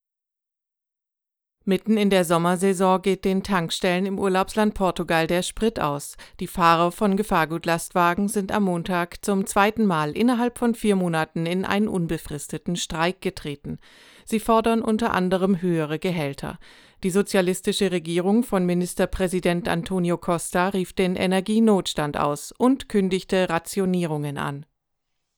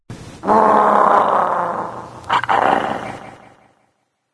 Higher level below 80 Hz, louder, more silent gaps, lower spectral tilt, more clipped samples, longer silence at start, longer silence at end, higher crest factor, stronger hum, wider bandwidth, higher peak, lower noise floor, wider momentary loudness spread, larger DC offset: first, -46 dBFS vs -54 dBFS; second, -23 LUFS vs -16 LUFS; neither; about the same, -5.5 dB/octave vs -5.5 dB/octave; neither; first, 1.65 s vs 0.1 s; second, 0.75 s vs 1 s; about the same, 20 dB vs 18 dB; neither; first, 19.5 kHz vs 11 kHz; second, -4 dBFS vs 0 dBFS; first, -87 dBFS vs -66 dBFS; second, 9 LU vs 19 LU; neither